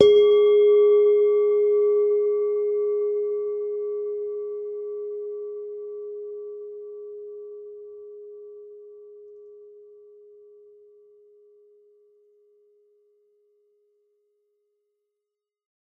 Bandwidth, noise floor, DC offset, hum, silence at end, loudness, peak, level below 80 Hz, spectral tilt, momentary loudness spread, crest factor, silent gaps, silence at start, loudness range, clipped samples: 3.5 kHz; -86 dBFS; under 0.1%; none; 6.3 s; -22 LUFS; 0 dBFS; -70 dBFS; -5.5 dB/octave; 25 LU; 24 dB; none; 0 s; 25 LU; under 0.1%